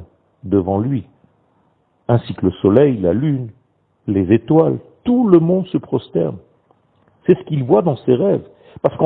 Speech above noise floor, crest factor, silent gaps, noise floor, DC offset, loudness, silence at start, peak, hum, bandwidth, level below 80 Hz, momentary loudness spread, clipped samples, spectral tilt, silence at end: 45 dB; 16 dB; none; -60 dBFS; under 0.1%; -17 LUFS; 0 s; 0 dBFS; none; 4.4 kHz; -50 dBFS; 11 LU; under 0.1%; -12 dB/octave; 0 s